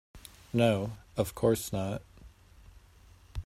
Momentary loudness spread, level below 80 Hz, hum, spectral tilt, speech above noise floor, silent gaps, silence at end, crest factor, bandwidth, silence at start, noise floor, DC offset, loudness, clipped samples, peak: 18 LU; -52 dBFS; none; -6 dB/octave; 28 dB; none; 0.05 s; 20 dB; 16 kHz; 0.15 s; -57 dBFS; under 0.1%; -31 LUFS; under 0.1%; -12 dBFS